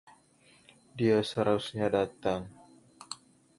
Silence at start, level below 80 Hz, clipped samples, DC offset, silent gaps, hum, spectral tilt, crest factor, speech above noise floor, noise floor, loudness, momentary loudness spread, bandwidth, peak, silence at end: 0.95 s; -62 dBFS; under 0.1%; under 0.1%; none; none; -6 dB/octave; 20 dB; 34 dB; -63 dBFS; -30 LUFS; 17 LU; 11.5 kHz; -12 dBFS; 0.45 s